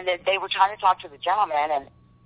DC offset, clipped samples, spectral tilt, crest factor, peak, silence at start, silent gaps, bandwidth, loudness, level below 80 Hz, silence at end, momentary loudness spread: under 0.1%; under 0.1%; -6 dB/octave; 18 dB; -6 dBFS; 0 s; none; 4 kHz; -23 LUFS; -62 dBFS; 0.4 s; 6 LU